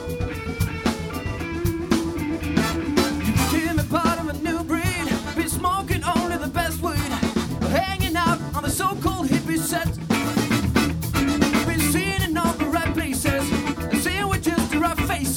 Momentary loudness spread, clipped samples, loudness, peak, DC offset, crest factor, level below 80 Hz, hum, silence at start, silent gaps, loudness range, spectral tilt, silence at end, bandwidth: 5 LU; under 0.1%; -23 LUFS; -4 dBFS; under 0.1%; 18 dB; -36 dBFS; none; 0 s; none; 2 LU; -4.5 dB/octave; 0 s; over 20 kHz